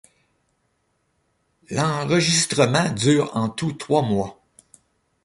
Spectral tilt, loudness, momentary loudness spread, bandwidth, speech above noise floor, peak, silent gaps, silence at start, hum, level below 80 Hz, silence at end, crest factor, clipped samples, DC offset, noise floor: -4.5 dB/octave; -21 LUFS; 8 LU; 11.5 kHz; 49 dB; -4 dBFS; none; 1.7 s; none; -56 dBFS; 0.9 s; 20 dB; under 0.1%; under 0.1%; -70 dBFS